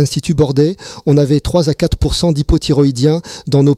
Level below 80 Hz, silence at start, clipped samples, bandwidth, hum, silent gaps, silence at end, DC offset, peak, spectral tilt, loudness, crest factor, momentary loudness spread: -26 dBFS; 0 s; under 0.1%; 13.5 kHz; none; none; 0 s; under 0.1%; -2 dBFS; -6.5 dB/octave; -14 LUFS; 12 dB; 4 LU